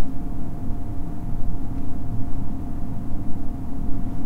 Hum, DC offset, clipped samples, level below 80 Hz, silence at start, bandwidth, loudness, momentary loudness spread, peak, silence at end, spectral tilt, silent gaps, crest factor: none; under 0.1%; under 0.1%; -28 dBFS; 0 s; 2 kHz; -32 LUFS; 2 LU; -6 dBFS; 0 s; -9.5 dB/octave; none; 10 dB